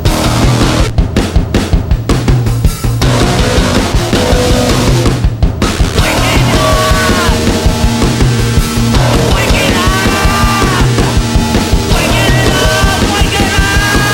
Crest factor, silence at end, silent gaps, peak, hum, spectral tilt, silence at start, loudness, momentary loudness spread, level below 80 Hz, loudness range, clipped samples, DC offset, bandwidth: 10 dB; 0 s; none; 0 dBFS; none; -4.5 dB/octave; 0 s; -10 LUFS; 4 LU; -14 dBFS; 2 LU; under 0.1%; under 0.1%; 17 kHz